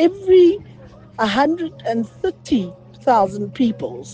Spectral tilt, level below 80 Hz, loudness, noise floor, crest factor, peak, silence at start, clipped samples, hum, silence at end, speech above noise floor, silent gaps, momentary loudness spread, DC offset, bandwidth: -6 dB/octave; -52 dBFS; -18 LUFS; -42 dBFS; 16 dB; -2 dBFS; 0 s; under 0.1%; none; 0 s; 24 dB; none; 14 LU; under 0.1%; 8.4 kHz